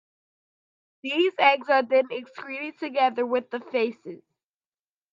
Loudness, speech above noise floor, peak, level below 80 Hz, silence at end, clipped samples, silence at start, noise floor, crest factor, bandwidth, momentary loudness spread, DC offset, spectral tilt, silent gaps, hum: -24 LUFS; over 65 dB; -4 dBFS; -82 dBFS; 0.95 s; under 0.1%; 1.05 s; under -90 dBFS; 22 dB; 7.4 kHz; 16 LU; under 0.1%; -5 dB/octave; none; none